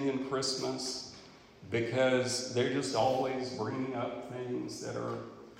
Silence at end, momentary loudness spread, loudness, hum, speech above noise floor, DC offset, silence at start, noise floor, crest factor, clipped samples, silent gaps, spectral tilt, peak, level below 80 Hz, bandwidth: 0 s; 11 LU; -34 LUFS; none; 21 dB; under 0.1%; 0 s; -54 dBFS; 18 dB; under 0.1%; none; -4 dB/octave; -16 dBFS; -70 dBFS; 16 kHz